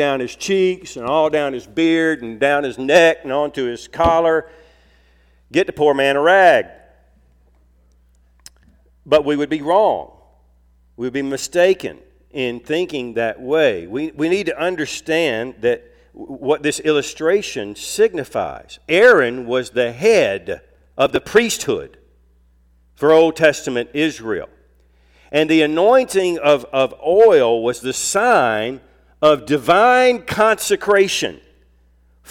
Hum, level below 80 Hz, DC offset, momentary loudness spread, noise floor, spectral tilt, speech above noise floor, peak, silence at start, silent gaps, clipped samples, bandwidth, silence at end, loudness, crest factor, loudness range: none; -50 dBFS; under 0.1%; 13 LU; -54 dBFS; -4 dB/octave; 38 dB; -2 dBFS; 0 s; none; under 0.1%; 16.5 kHz; 0.95 s; -17 LUFS; 16 dB; 5 LU